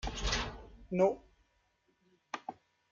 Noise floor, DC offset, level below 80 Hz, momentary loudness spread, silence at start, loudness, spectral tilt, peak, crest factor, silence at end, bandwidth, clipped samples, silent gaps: -75 dBFS; under 0.1%; -48 dBFS; 17 LU; 0.05 s; -35 LUFS; -4.5 dB/octave; -16 dBFS; 22 dB; 0.4 s; 7.6 kHz; under 0.1%; none